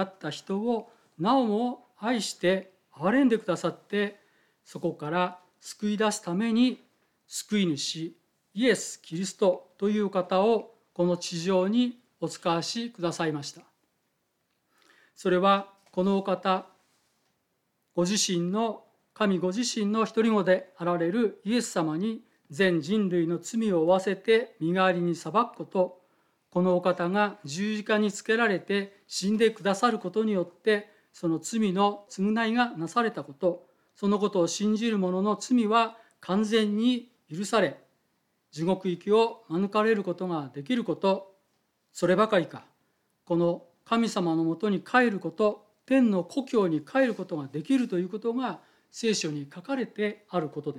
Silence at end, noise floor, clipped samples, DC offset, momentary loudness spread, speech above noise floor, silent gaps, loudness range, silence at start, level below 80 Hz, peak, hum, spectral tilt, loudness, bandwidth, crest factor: 0 s; -76 dBFS; under 0.1%; under 0.1%; 10 LU; 49 dB; none; 3 LU; 0 s; -78 dBFS; -8 dBFS; none; -5 dB/octave; -27 LUFS; 14 kHz; 20 dB